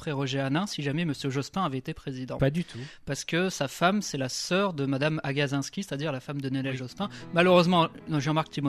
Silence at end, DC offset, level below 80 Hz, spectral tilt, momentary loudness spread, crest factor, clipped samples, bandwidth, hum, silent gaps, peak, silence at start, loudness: 0 s; under 0.1%; -56 dBFS; -5.5 dB/octave; 11 LU; 20 dB; under 0.1%; 14 kHz; none; none; -8 dBFS; 0 s; -28 LUFS